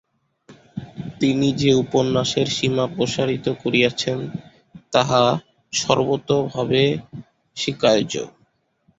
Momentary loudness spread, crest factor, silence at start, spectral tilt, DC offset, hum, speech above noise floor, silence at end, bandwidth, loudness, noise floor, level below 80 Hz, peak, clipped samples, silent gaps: 17 LU; 20 dB; 0.5 s; -5 dB/octave; under 0.1%; none; 44 dB; 0.7 s; 8 kHz; -20 LUFS; -63 dBFS; -54 dBFS; -2 dBFS; under 0.1%; none